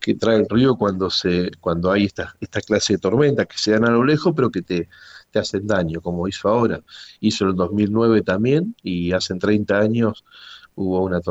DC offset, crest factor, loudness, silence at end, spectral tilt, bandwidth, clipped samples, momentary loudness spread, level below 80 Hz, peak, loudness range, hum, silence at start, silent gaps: under 0.1%; 14 dB; -20 LUFS; 0 s; -6 dB/octave; 8.2 kHz; under 0.1%; 9 LU; -50 dBFS; -4 dBFS; 3 LU; none; 0 s; none